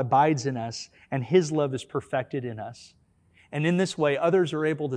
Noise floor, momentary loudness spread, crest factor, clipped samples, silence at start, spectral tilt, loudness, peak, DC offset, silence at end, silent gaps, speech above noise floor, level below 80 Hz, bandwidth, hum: -61 dBFS; 13 LU; 18 dB; under 0.1%; 0 s; -6 dB/octave; -26 LUFS; -8 dBFS; under 0.1%; 0 s; none; 35 dB; -66 dBFS; 10.5 kHz; none